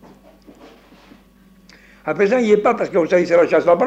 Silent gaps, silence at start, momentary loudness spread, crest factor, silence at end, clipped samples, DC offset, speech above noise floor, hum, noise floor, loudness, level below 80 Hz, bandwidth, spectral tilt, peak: none; 2.05 s; 7 LU; 16 dB; 0 s; under 0.1%; under 0.1%; 35 dB; none; -50 dBFS; -16 LUFS; -56 dBFS; 8.2 kHz; -6.5 dB/octave; -2 dBFS